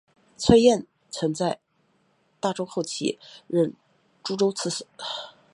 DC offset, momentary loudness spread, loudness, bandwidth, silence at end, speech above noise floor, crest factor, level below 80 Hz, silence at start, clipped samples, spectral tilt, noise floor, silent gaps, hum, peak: under 0.1%; 17 LU; -25 LUFS; 11 kHz; 0.25 s; 43 dB; 24 dB; -52 dBFS; 0.4 s; under 0.1%; -5 dB/octave; -67 dBFS; none; none; -2 dBFS